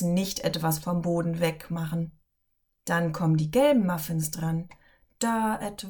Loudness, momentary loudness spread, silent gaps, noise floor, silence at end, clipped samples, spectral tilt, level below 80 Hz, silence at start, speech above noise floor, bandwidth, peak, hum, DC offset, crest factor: -27 LUFS; 11 LU; none; -75 dBFS; 0 s; under 0.1%; -5.5 dB/octave; -54 dBFS; 0 s; 48 dB; 19 kHz; -12 dBFS; none; under 0.1%; 16 dB